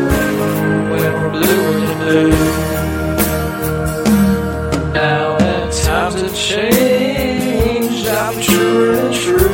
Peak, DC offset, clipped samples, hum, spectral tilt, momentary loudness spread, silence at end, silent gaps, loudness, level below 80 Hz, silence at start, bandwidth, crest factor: 0 dBFS; under 0.1%; under 0.1%; none; -5 dB/octave; 6 LU; 0 s; none; -15 LUFS; -28 dBFS; 0 s; 17 kHz; 14 dB